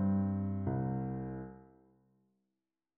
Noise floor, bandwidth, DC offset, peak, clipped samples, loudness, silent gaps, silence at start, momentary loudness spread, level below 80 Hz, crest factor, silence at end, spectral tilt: -90 dBFS; 2.3 kHz; under 0.1%; -22 dBFS; under 0.1%; -37 LUFS; none; 0 s; 15 LU; -60 dBFS; 14 dB; 1.35 s; -12.5 dB/octave